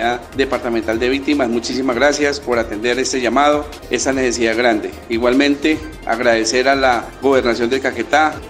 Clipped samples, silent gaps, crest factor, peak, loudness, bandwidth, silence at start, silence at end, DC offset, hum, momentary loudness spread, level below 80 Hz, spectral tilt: under 0.1%; none; 16 dB; 0 dBFS; -16 LUFS; 16 kHz; 0 s; 0 s; under 0.1%; none; 5 LU; -40 dBFS; -3.5 dB/octave